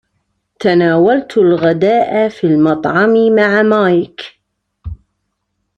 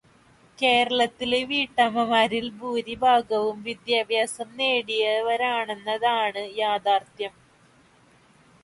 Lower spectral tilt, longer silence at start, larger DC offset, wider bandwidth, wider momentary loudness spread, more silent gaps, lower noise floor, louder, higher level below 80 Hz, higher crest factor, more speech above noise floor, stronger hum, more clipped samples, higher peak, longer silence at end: first, -8 dB/octave vs -3 dB/octave; about the same, 0.6 s vs 0.6 s; neither; second, 8 kHz vs 11.5 kHz; first, 21 LU vs 9 LU; neither; first, -69 dBFS vs -57 dBFS; first, -12 LUFS vs -24 LUFS; first, -44 dBFS vs -64 dBFS; second, 12 dB vs 18 dB; first, 58 dB vs 33 dB; neither; neither; first, -2 dBFS vs -8 dBFS; second, 0.85 s vs 1.35 s